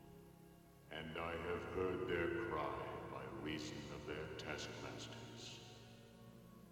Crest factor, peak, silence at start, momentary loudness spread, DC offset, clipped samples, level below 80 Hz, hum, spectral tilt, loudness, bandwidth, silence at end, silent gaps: 18 dB; -28 dBFS; 0 s; 20 LU; under 0.1%; under 0.1%; -66 dBFS; none; -5 dB/octave; -46 LUFS; 17.5 kHz; 0 s; none